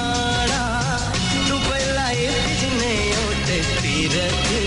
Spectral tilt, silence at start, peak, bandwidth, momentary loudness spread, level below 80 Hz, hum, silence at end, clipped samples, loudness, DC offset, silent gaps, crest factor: -3.5 dB/octave; 0 s; -10 dBFS; 11 kHz; 2 LU; -32 dBFS; none; 0 s; under 0.1%; -20 LUFS; under 0.1%; none; 10 dB